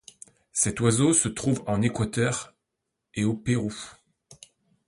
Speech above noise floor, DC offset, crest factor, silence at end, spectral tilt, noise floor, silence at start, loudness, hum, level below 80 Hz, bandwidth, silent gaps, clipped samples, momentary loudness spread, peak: 57 dB; under 0.1%; 20 dB; 0.55 s; -4.5 dB/octave; -82 dBFS; 0.55 s; -25 LUFS; none; -52 dBFS; 11.5 kHz; none; under 0.1%; 16 LU; -6 dBFS